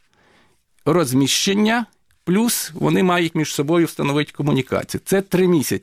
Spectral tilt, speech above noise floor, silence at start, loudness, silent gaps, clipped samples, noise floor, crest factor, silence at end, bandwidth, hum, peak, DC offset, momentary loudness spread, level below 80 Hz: -4.5 dB/octave; 39 dB; 0.85 s; -19 LUFS; none; under 0.1%; -57 dBFS; 12 dB; 0.05 s; 16.5 kHz; none; -8 dBFS; under 0.1%; 6 LU; -54 dBFS